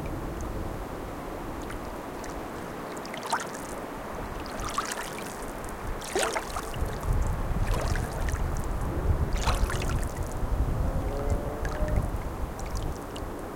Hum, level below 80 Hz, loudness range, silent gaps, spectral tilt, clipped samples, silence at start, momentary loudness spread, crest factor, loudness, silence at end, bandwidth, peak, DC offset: none; -34 dBFS; 5 LU; none; -5 dB/octave; under 0.1%; 0 s; 8 LU; 20 dB; -33 LUFS; 0 s; 17 kHz; -10 dBFS; under 0.1%